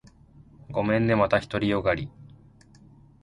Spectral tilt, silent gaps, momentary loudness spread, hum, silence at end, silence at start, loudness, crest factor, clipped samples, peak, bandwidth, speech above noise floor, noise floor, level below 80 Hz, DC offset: -7.5 dB/octave; none; 10 LU; none; 0.95 s; 0.7 s; -25 LUFS; 18 dB; under 0.1%; -8 dBFS; 11 kHz; 29 dB; -53 dBFS; -50 dBFS; under 0.1%